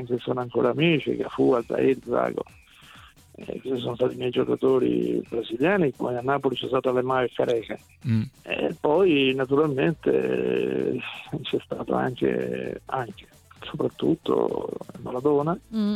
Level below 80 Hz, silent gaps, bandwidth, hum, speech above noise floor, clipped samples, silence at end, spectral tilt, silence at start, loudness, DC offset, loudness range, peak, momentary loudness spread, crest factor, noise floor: -58 dBFS; none; 13 kHz; none; 25 dB; under 0.1%; 0 s; -7.5 dB/octave; 0 s; -25 LUFS; under 0.1%; 4 LU; -8 dBFS; 11 LU; 18 dB; -50 dBFS